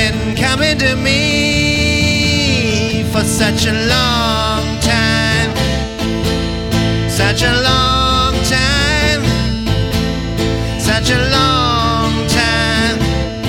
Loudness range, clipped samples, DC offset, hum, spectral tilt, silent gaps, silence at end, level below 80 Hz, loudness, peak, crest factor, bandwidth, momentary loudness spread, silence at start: 2 LU; under 0.1%; under 0.1%; none; -4 dB/octave; none; 0 s; -24 dBFS; -13 LUFS; 0 dBFS; 14 dB; 17 kHz; 5 LU; 0 s